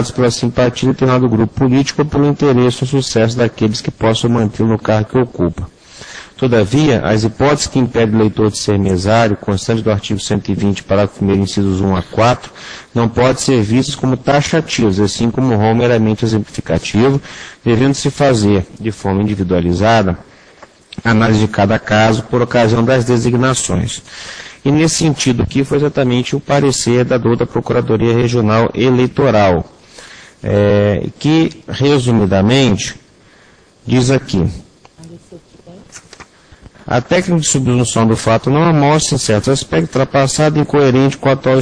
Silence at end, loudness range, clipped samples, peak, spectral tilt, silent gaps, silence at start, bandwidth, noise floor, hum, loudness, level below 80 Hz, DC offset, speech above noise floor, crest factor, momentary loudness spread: 0 s; 3 LU; under 0.1%; 0 dBFS; -5.5 dB/octave; none; 0 s; 10.5 kHz; -46 dBFS; none; -13 LUFS; -38 dBFS; under 0.1%; 34 dB; 14 dB; 7 LU